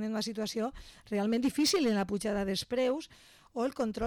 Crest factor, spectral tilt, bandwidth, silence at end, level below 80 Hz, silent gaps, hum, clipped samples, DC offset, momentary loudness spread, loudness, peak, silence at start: 10 dB; -4.5 dB/octave; 18 kHz; 0 s; -58 dBFS; none; none; under 0.1%; under 0.1%; 10 LU; -32 LUFS; -22 dBFS; 0 s